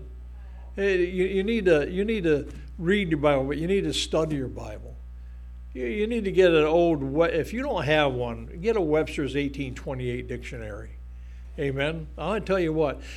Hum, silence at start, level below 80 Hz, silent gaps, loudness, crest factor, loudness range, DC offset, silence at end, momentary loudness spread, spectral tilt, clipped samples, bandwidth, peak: 60 Hz at -40 dBFS; 0 s; -40 dBFS; none; -25 LUFS; 20 dB; 6 LU; under 0.1%; 0 s; 21 LU; -6 dB/octave; under 0.1%; 13 kHz; -6 dBFS